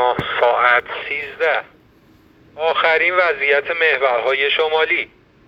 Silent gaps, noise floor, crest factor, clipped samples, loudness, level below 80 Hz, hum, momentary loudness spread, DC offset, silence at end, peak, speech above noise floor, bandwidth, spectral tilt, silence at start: none; -51 dBFS; 18 dB; under 0.1%; -16 LUFS; -56 dBFS; none; 9 LU; under 0.1%; 0.4 s; 0 dBFS; 33 dB; 7.4 kHz; -4.5 dB/octave; 0 s